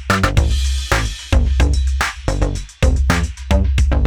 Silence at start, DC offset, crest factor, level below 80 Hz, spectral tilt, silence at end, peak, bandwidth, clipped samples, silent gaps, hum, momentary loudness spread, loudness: 0 s; under 0.1%; 16 dB; -18 dBFS; -5 dB/octave; 0 s; 0 dBFS; 14.5 kHz; under 0.1%; none; none; 5 LU; -18 LUFS